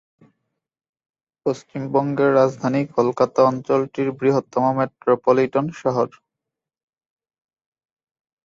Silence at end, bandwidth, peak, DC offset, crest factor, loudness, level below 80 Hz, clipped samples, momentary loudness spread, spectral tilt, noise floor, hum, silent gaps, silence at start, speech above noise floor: 2.35 s; 7.6 kHz; -4 dBFS; under 0.1%; 18 dB; -20 LUFS; -64 dBFS; under 0.1%; 8 LU; -7.5 dB/octave; -85 dBFS; none; none; 1.45 s; 66 dB